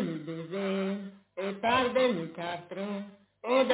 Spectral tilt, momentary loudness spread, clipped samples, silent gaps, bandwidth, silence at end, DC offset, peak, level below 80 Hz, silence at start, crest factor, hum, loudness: -9.5 dB/octave; 13 LU; under 0.1%; none; 4 kHz; 0 s; under 0.1%; -14 dBFS; -68 dBFS; 0 s; 16 dB; none; -31 LUFS